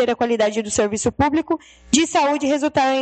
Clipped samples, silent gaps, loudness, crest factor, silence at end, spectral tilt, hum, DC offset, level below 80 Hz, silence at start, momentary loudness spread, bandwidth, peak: under 0.1%; none; -19 LUFS; 18 dB; 0 s; -3.5 dB/octave; none; under 0.1%; -46 dBFS; 0 s; 4 LU; 9 kHz; 0 dBFS